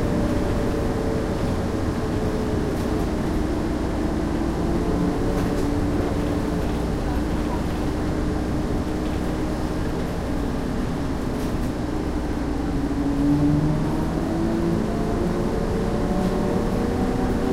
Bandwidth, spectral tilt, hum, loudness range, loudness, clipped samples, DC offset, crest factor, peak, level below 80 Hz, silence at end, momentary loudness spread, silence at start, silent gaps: 16 kHz; -7 dB/octave; none; 3 LU; -24 LUFS; under 0.1%; under 0.1%; 14 dB; -10 dBFS; -30 dBFS; 0 s; 3 LU; 0 s; none